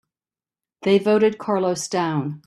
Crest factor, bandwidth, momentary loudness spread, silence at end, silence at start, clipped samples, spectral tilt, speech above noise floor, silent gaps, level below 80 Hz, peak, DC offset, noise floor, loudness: 16 dB; 13 kHz; 6 LU; 0.1 s; 0.8 s; under 0.1%; -5.5 dB/octave; over 70 dB; none; -66 dBFS; -6 dBFS; under 0.1%; under -90 dBFS; -21 LUFS